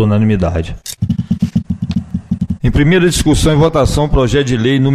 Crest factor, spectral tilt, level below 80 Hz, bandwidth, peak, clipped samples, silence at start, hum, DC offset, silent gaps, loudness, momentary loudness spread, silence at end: 12 dB; -6 dB/octave; -24 dBFS; 15.5 kHz; 0 dBFS; under 0.1%; 0 s; none; under 0.1%; none; -14 LUFS; 9 LU; 0 s